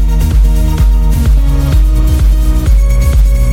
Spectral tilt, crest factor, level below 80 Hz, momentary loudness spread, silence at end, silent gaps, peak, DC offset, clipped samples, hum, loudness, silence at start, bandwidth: -6.5 dB/octave; 6 dB; -8 dBFS; 1 LU; 0 s; none; 0 dBFS; under 0.1%; under 0.1%; none; -11 LUFS; 0 s; 16 kHz